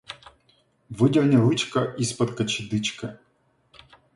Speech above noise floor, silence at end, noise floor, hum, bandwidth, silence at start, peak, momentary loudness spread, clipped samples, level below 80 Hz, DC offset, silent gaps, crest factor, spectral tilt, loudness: 43 dB; 1 s; -66 dBFS; none; 11.5 kHz; 0.1 s; -6 dBFS; 20 LU; under 0.1%; -60 dBFS; under 0.1%; none; 18 dB; -5.5 dB/octave; -23 LUFS